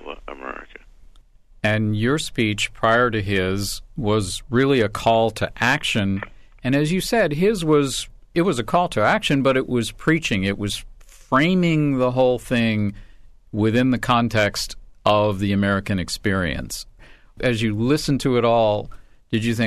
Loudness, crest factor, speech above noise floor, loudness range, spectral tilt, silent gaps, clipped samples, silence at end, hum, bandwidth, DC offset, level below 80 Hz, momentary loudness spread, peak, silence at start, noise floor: -20 LUFS; 14 dB; 29 dB; 2 LU; -5.5 dB/octave; none; under 0.1%; 0 s; none; 13.5 kHz; under 0.1%; -42 dBFS; 10 LU; -6 dBFS; 0 s; -49 dBFS